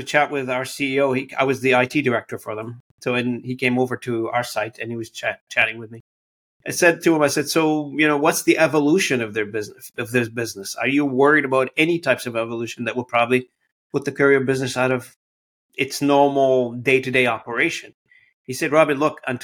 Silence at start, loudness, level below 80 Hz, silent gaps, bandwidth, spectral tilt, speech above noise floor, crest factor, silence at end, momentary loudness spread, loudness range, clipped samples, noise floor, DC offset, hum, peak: 0 s; -20 LUFS; -64 dBFS; 2.80-2.98 s, 5.41-5.47 s, 6.00-6.60 s, 13.72-13.90 s, 15.16-15.69 s, 17.94-18.05 s, 18.33-18.44 s; 17.5 kHz; -4.5 dB/octave; over 70 dB; 18 dB; 0 s; 12 LU; 4 LU; under 0.1%; under -90 dBFS; under 0.1%; none; -2 dBFS